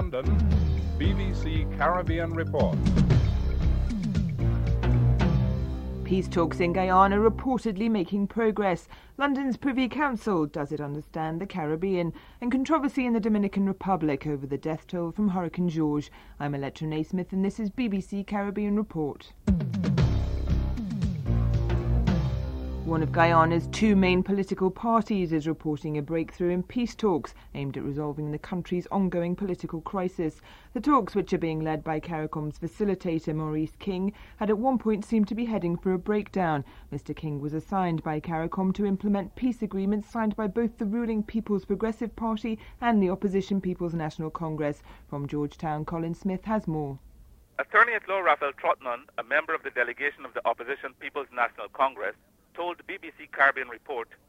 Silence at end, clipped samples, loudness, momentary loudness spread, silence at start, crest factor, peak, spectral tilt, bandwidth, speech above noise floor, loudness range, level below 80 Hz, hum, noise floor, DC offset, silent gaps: 0.25 s; under 0.1%; -28 LUFS; 10 LU; 0 s; 20 dB; -6 dBFS; -8 dB/octave; 10 kHz; 26 dB; 6 LU; -36 dBFS; none; -54 dBFS; under 0.1%; none